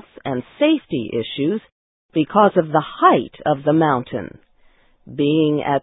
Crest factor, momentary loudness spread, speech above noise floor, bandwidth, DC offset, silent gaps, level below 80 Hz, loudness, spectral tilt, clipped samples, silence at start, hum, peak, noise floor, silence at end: 18 dB; 12 LU; 36 dB; 4 kHz; under 0.1%; 1.72-2.09 s; -56 dBFS; -19 LUFS; -11.5 dB/octave; under 0.1%; 0.25 s; none; 0 dBFS; -54 dBFS; 0.05 s